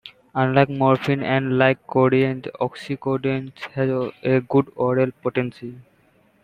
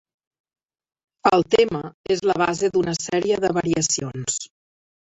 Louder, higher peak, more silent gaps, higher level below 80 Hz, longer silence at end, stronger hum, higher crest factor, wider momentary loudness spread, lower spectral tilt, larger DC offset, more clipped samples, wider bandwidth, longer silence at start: about the same, -21 LUFS vs -21 LUFS; about the same, -2 dBFS vs -2 dBFS; second, none vs 1.94-2.04 s; about the same, -58 dBFS vs -56 dBFS; about the same, 0.65 s vs 0.7 s; neither; about the same, 20 dB vs 20 dB; about the same, 10 LU vs 8 LU; first, -8.5 dB/octave vs -4 dB/octave; neither; neither; about the same, 9 kHz vs 8.4 kHz; second, 0.05 s vs 1.25 s